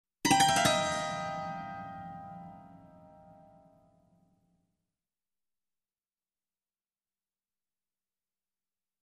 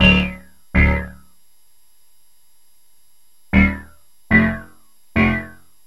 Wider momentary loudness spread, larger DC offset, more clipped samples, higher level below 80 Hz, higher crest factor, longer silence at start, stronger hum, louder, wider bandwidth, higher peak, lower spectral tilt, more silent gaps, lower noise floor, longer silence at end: first, 22 LU vs 18 LU; second, under 0.1% vs 0.6%; neither; second, -66 dBFS vs -28 dBFS; about the same, 24 dB vs 20 dB; first, 0.25 s vs 0 s; neither; second, -29 LUFS vs -18 LUFS; about the same, 13 kHz vs 12 kHz; second, -12 dBFS vs 0 dBFS; second, -2.5 dB/octave vs -7 dB/octave; neither; first, under -90 dBFS vs -59 dBFS; first, 6.2 s vs 0.4 s